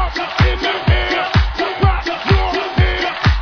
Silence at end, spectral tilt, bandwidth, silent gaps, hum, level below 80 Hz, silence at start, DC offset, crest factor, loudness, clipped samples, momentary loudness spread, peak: 0 s; -6 dB/octave; 5.4 kHz; none; none; -20 dBFS; 0 s; under 0.1%; 14 dB; -16 LUFS; under 0.1%; 3 LU; 0 dBFS